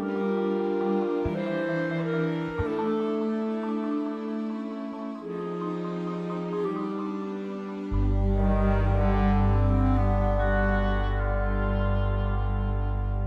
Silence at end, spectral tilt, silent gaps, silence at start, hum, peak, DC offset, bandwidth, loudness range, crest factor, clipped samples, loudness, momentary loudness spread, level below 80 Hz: 0 s; -9.5 dB/octave; none; 0 s; none; -12 dBFS; under 0.1%; 5.6 kHz; 7 LU; 14 dB; under 0.1%; -28 LUFS; 9 LU; -30 dBFS